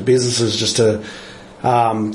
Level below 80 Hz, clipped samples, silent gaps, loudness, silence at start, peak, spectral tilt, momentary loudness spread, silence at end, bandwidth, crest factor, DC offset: -52 dBFS; under 0.1%; none; -17 LUFS; 0 s; -4 dBFS; -4.5 dB/octave; 18 LU; 0 s; 11.5 kHz; 14 dB; under 0.1%